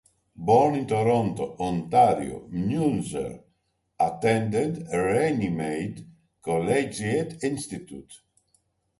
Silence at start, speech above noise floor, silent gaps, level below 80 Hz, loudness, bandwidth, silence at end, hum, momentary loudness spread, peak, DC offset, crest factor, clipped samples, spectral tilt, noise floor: 0.4 s; 48 dB; none; -56 dBFS; -25 LUFS; 11.5 kHz; 0.85 s; none; 15 LU; -8 dBFS; under 0.1%; 18 dB; under 0.1%; -6.5 dB/octave; -73 dBFS